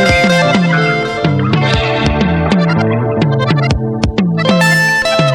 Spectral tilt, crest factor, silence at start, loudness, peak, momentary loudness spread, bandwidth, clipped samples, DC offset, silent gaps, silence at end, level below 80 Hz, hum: -5.5 dB/octave; 10 dB; 0 s; -12 LUFS; 0 dBFS; 5 LU; 16 kHz; under 0.1%; under 0.1%; none; 0 s; -28 dBFS; none